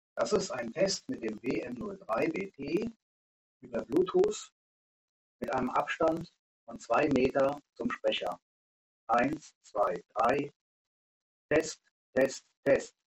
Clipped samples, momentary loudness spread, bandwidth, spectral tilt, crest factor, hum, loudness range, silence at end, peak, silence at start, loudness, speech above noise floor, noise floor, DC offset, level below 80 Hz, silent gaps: under 0.1%; 13 LU; 15.5 kHz; -4.5 dB/octave; 20 dB; none; 3 LU; 0.25 s; -14 dBFS; 0.15 s; -32 LUFS; over 59 dB; under -90 dBFS; under 0.1%; -62 dBFS; 3.02-3.61 s, 4.52-5.39 s, 6.39-6.67 s, 8.42-9.07 s, 9.56-9.61 s, 10.56-11.49 s, 11.91-12.13 s, 12.57-12.63 s